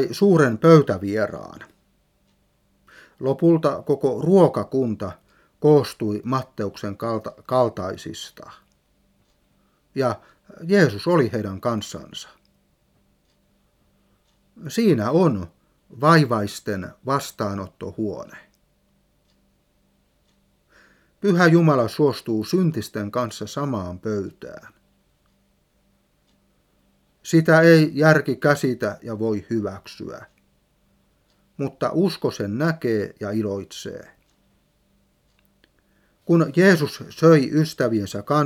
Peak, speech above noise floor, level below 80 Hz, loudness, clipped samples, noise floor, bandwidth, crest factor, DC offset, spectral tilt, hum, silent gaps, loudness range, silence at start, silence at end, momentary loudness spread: 0 dBFS; 44 dB; -62 dBFS; -21 LUFS; under 0.1%; -64 dBFS; 15.5 kHz; 22 dB; under 0.1%; -7 dB/octave; none; none; 12 LU; 0 s; 0 s; 19 LU